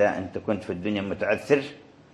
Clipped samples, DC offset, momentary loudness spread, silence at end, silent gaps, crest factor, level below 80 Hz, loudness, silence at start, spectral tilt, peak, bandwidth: under 0.1%; under 0.1%; 7 LU; 0.3 s; none; 20 dB; -54 dBFS; -27 LUFS; 0 s; -6.5 dB/octave; -6 dBFS; 12 kHz